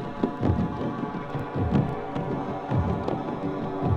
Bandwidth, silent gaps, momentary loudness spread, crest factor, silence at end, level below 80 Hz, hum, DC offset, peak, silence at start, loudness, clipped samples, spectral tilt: 8 kHz; none; 6 LU; 18 dB; 0 s; -42 dBFS; none; under 0.1%; -8 dBFS; 0 s; -28 LUFS; under 0.1%; -9.5 dB/octave